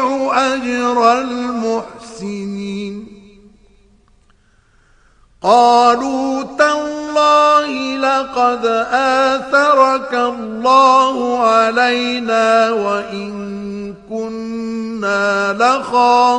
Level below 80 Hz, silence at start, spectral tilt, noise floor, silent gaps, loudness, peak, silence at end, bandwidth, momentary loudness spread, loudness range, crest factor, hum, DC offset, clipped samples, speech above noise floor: -54 dBFS; 0 s; -4 dB/octave; -53 dBFS; none; -14 LUFS; 0 dBFS; 0 s; 10 kHz; 14 LU; 11 LU; 16 dB; none; under 0.1%; under 0.1%; 39 dB